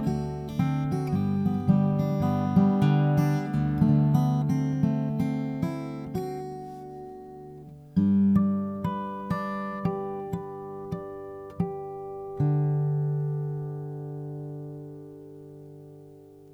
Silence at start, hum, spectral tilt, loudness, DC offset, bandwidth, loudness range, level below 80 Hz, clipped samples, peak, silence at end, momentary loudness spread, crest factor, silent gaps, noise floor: 0 s; none; -9.5 dB/octave; -27 LUFS; under 0.1%; 12.5 kHz; 9 LU; -52 dBFS; under 0.1%; -10 dBFS; 0 s; 20 LU; 18 dB; none; -49 dBFS